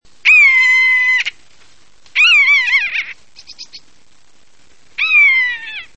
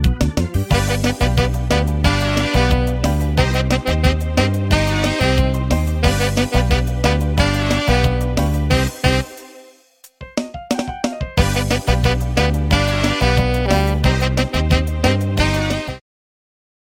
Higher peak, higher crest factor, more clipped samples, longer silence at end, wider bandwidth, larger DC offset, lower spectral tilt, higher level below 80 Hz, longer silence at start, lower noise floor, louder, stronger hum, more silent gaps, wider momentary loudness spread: about the same, -2 dBFS vs 0 dBFS; about the same, 12 dB vs 16 dB; neither; second, 0.15 s vs 1 s; second, 8.8 kHz vs 17 kHz; first, 1% vs under 0.1%; second, 3 dB/octave vs -5.5 dB/octave; second, -58 dBFS vs -22 dBFS; first, 0.25 s vs 0 s; first, -54 dBFS vs -49 dBFS; first, -9 LUFS vs -18 LUFS; neither; neither; first, 15 LU vs 5 LU